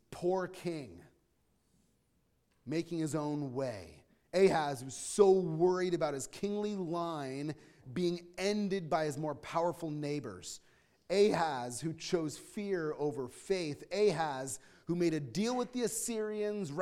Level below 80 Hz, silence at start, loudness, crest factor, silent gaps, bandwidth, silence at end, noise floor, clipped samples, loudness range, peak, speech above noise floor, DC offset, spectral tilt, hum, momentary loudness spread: -68 dBFS; 0.1 s; -35 LUFS; 22 dB; none; 15 kHz; 0 s; -75 dBFS; under 0.1%; 8 LU; -12 dBFS; 41 dB; under 0.1%; -5 dB/octave; none; 13 LU